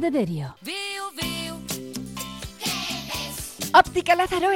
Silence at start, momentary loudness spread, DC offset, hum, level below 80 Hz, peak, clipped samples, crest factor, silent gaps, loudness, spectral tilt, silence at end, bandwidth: 0 s; 15 LU; 0.1%; none; -48 dBFS; -4 dBFS; under 0.1%; 20 dB; none; -25 LUFS; -3.5 dB/octave; 0 s; 17 kHz